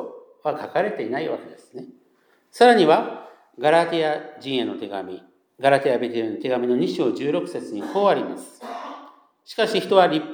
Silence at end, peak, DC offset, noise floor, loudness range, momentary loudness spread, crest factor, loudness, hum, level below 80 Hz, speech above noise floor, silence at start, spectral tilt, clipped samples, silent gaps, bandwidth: 0 s; -2 dBFS; under 0.1%; -61 dBFS; 4 LU; 20 LU; 20 dB; -21 LUFS; none; -84 dBFS; 40 dB; 0 s; -5.5 dB/octave; under 0.1%; none; 19.5 kHz